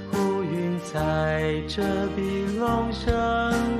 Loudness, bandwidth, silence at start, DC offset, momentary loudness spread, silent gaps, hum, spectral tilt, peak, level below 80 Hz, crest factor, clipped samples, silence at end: -25 LUFS; 14 kHz; 0 s; under 0.1%; 3 LU; none; none; -6.5 dB/octave; -10 dBFS; -38 dBFS; 16 dB; under 0.1%; 0 s